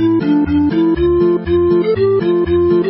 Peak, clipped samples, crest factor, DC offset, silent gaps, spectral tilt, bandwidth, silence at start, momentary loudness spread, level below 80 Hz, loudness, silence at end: -4 dBFS; under 0.1%; 10 dB; under 0.1%; none; -13 dB/octave; 5.8 kHz; 0 s; 1 LU; -32 dBFS; -13 LUFS; 0 s